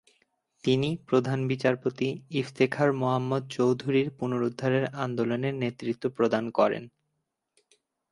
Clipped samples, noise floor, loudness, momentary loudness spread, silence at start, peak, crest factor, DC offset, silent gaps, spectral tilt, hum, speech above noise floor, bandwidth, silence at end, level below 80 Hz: under 0.1%; -81 dBFS; -28 LUFS; 7 LU; 0.65 s; -10 dBFS; 18 dB; under 0.1%; none; -7 dB/octave; none; 54 dB; 11.5 kHz; 1.25 s; -68 dBFS